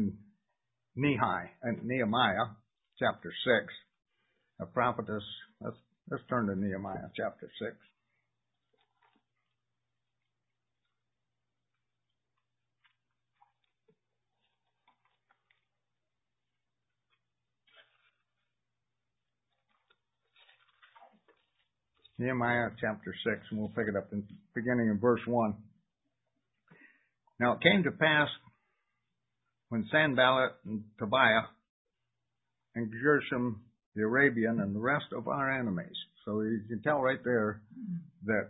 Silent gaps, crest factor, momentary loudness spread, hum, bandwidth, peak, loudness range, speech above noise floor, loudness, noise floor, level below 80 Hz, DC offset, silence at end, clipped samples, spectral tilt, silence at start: 31.69-31.85 s, 33.86-33.92 s; 28 dB; 16 LU; none; 3.9 kHz; -6 dBFS; 8 LU; 58 dB; -31 LUFS; -89 dBFS; -68 dBFS; under 0.1%; 0 s; under 0.1%; -2 dB/octave; 0 s